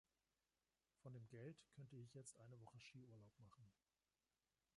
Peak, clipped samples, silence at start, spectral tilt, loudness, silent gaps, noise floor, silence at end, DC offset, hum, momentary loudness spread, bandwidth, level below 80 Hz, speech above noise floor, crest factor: -48 dBFS; under 0.1%; 1 s; -5.5 dB/octave; -63 LUFS; none; under -90 dBFS; 1.05 s; under 0.1%; none; 6 LU; 11 kHz; -90 dBFS; over 27 dB; 18 dB